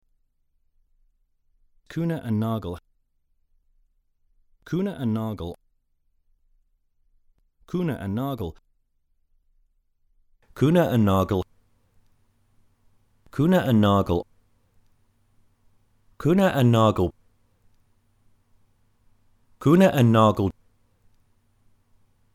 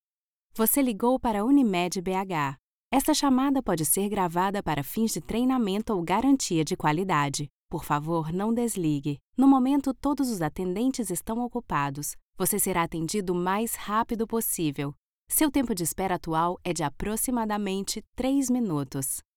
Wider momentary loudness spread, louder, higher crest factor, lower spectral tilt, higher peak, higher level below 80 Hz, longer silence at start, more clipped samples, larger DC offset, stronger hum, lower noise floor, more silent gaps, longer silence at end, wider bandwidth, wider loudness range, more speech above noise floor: first, 17 LU vs 7 LU; first, -22 LUFS vs -26 LUFS; about the same, 20 dB vs 18 dB; first, -7.5 dB/octave vs -4.5 dB/octave; first, -6 dBFS vs -10 dBFS; second, -56 dBFS vs -50 dBFS; first, 1.9 s vs 0.55 s; neither; neither; neither; second, -68 dBFS vs under -90 dBFS; second, none vs 2.59-2.91 s, 7.50-7.69 s, 9.21-9.33 s, 12.22-12.33 s, 14.99-15.27 s, 18.07-18.13 s; first, 1.85 s vs 0.15 s; second, 15.5 kHz vs 19.5 kHz; first, 11 LU vs 3 LU; second, 47 dB vs over 64 dB